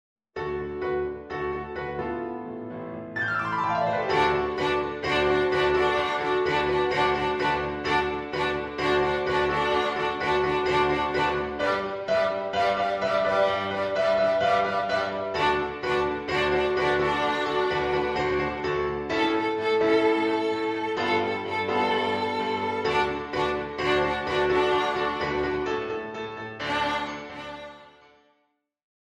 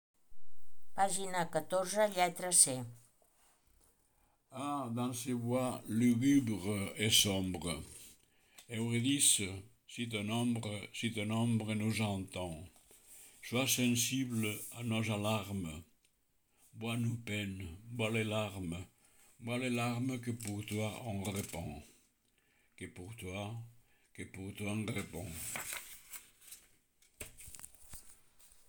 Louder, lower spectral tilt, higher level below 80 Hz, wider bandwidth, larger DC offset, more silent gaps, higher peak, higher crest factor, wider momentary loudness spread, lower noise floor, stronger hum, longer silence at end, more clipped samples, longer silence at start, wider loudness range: first, -25 LUFS vs -35 LUFS; first, -5.5 dB/octave vs -3.5 dB/octave; first, -50 dBFS vs -68 dBFS; second, 10.5 kHz vs over 20 kHz; neither; neither; about the same, -10 dBFS vs -12 dBFS; second, 16 dB vs 26 dB; second, 9 LU vs 22 LU; about the same, -73 dBFS vs -75 dBFS; neither; first, 1.25 s vs 0.05 s; neither; about the same, 0.35 s vs 0.3 s; second, 5 LU vs 11 LU